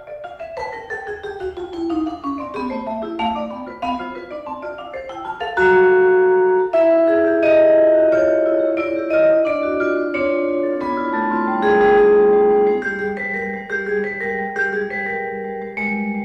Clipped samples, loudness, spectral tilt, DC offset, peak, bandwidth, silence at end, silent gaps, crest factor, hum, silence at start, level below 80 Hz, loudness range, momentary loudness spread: under 0.1%; -18 LUFS; -7 dB/octave; under 0.1%; -6 dBFS; 6.8 kHz; 0 s; none; 12 dB; none; 0 s; -50 dBFS; 11 LU; 16 LU